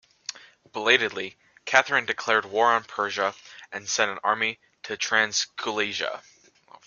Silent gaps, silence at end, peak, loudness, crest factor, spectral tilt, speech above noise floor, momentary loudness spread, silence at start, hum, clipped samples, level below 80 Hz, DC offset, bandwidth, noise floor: none; 0.65 s; 0 dBFS; -24 LUFS; 26 dB; -1 dB/octave; 29 dB; 17 LU; 0.3 s; none; under 0.1%; -72 dBFS; under 0.1%; 10 kHz; -54 dBFS